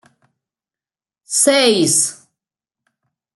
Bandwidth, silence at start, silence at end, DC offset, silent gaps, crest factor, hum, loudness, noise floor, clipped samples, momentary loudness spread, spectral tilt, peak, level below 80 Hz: 12.5 kHz; 1.3 s; 1.2 s; under 0.1%; none; 20 dB; none; -14 LUFS; under -90 dBFS; under 0.1%; 9 LU; -2 dB/octave; 0 dBFS; -66 dBFS